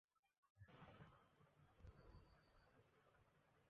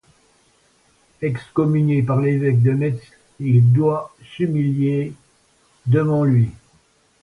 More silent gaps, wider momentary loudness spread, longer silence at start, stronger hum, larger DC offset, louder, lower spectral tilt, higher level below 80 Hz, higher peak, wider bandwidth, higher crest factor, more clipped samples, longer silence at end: first, 0.19-0.23 s, 0.38-0.43 s, 0.50-0.55 s vs none; second, 4 LU vs 12 LU; second, 0.15 s vs 1.2 s; neither; neither; second, -68 LUFS vs -19 LUFS; second, -5.5 dB/octave vs -10 dB/octave; second, -76 dBFS vs -54 dBFS; second, -52 dBFS vs -4 dBFS; about the same, 4.9 kHz vs 4.6 kHz; about the same, 18 dB vs 14 dB; neither; second, 0 s vs 0.7 s